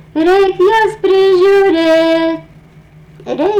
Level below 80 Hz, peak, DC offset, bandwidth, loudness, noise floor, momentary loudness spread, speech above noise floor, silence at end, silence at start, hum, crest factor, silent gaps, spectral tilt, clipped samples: -46 dBFS; -4 dBFS; under 0.1%; 10 kHz; -10 LUFS; -40 dBFS; 9 LU; 30 dB; 0 s; 0.15 s; none; 6 dB; none; -5 dB/octave; under 0.1%